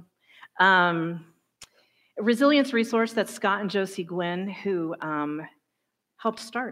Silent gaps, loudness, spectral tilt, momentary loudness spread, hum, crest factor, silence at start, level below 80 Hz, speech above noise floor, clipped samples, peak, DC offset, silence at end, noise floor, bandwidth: none; -25 LUFS; -5 dB/octave; 13 LU; none; 20 dB; 0.55 s; -78 dBFS; 55 dB; under 0.1%; -6 dBFS; under 0.1%; 0 s; -80 dBFS; 16 kHz